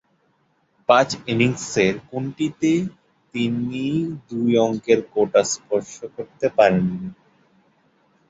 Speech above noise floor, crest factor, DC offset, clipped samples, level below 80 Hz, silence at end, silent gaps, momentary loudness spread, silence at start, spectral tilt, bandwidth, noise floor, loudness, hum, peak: 44 dB; 20 dB; under 0.1%; under 0.1%; -58 dBFS; 1.15 s; none; 14 LU; 0.9 s; -5 dB/octave; 8 kHz; -65 dBFS; -21 LUFS; none; -2 dBFS